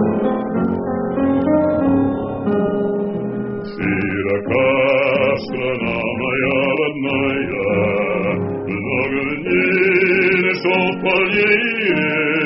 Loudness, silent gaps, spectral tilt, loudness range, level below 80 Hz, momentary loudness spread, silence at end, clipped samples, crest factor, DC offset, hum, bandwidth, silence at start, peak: -17 LUFS; none; -4.5 dB/octave; 3 LU; -48 dBFS; 7 LU; 0 s; under 0.1%; 14 dB; under 0.1%; none; 5.8 kHz; 0 s; -4 dBFS